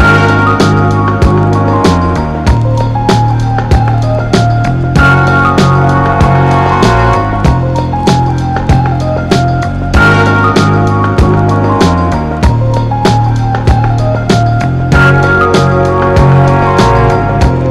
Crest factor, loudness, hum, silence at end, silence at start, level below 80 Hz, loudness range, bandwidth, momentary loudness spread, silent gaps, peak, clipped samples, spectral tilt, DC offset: 8 dB; -9 LUFS; none; 0 s; 0 s; -18 dBFS; 2 LU; 12 kHz; 5 LU; none; 0 dBFS; under 0.1%; -7 dB/octave; under 0.1%